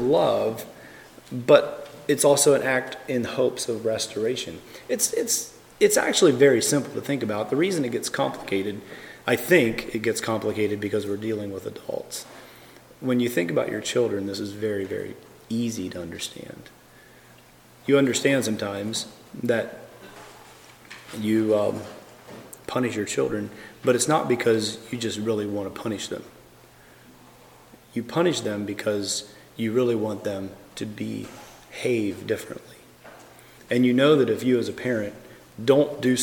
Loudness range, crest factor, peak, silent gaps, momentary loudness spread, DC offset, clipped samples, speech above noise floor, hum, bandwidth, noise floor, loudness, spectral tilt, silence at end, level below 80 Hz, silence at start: 8 LU; 22 dB; -2 dBFS; none; 20 LU; under 0.1%; under 0.1%; 28 dB; none; 18 kHz; -52 dBFS; -24 LUFS; -4 dB/octave; 0 s; -62 dBFS; 0 s